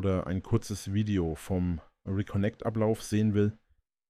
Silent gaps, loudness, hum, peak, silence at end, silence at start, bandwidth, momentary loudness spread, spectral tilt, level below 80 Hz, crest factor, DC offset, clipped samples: none; -31 LUFS; none; -16 dBFS; 0.55 s; 0 s; 14.5 kHz; 6 LU; -7 dB/octave; -50 dBFS; 14 dB; under 0.1%; under 0.1%